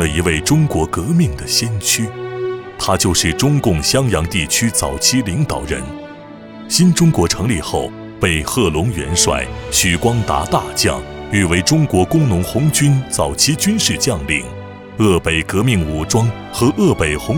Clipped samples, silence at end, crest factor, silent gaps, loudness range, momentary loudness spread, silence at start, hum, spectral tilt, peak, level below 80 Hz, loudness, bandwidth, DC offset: under 0.1%; 0 s; 16 dB; none; 2 LU; 10 LU; 0 s; none; -4 dB/octave; 0 dBFS; -32 dBFS; -15 LUFS; 19.5 kHz; under 0.1%